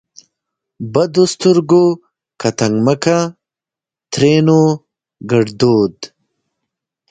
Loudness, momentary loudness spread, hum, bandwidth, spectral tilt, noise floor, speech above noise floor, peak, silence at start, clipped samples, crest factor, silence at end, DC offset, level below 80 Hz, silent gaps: -14 LUFS; 14 LU; none; 9.4 kHz; -6 dB/octave; -88 dBFS; 75 dB; 0 dBFS; 0.8 s; under 0.1%; 16 dB; 1.05 s; under 0.1%; -54 dBFS; none